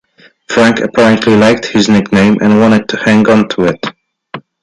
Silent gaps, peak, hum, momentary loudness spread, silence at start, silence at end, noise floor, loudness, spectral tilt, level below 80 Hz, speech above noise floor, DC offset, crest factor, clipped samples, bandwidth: none; 0 dBFS; none; 14 LU; 0.5 s; 0.25 s; -31 dBFS; -9 LUFS; -5.5 dB/octave; -44 dBFS; 22 dB; under 0.1%; 10 dB; under 0.1%; 10.5 kHz